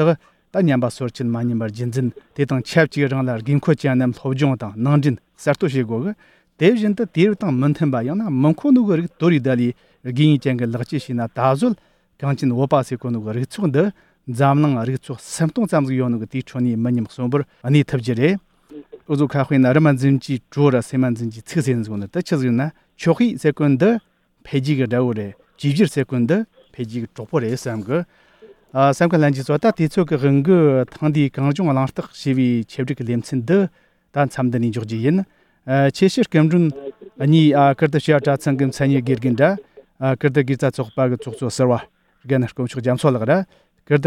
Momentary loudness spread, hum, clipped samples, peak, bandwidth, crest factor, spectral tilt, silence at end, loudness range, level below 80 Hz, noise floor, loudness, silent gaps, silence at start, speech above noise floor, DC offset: 10 LU; none; under 0.1%; -2 dBFS; 12.5 kHz; 18 dB; -7.5 dB/octave; 0 s; 4 LU; -58 dBFS; -48 dBFS; -19 LUFS; none; 0 s; 30 dB; under 0.1%